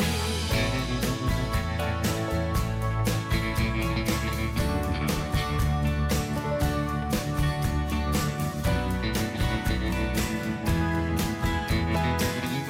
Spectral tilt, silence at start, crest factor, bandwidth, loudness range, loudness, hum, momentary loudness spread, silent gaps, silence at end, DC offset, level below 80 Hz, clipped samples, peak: -5.5 dB/octave; 0 s; 12 dB; 16.5 kHz; 0 LU; -27 LUFS; none; 2 LU; none; 0 s; under 0.1%; -32 dBFS; under 0.1%; -14 dBFS